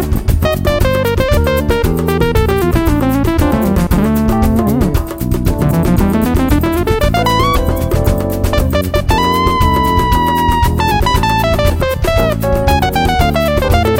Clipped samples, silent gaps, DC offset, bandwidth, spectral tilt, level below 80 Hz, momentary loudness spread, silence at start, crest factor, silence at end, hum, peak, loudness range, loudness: under 0.1%; none; under 0.1%; 16.5 kHz; -6 dB/octave; -18 dBFS; 3 LU; 0 s; 12 dB; 0 s; none; 0 dBFS; 1 LU; -13 LUFS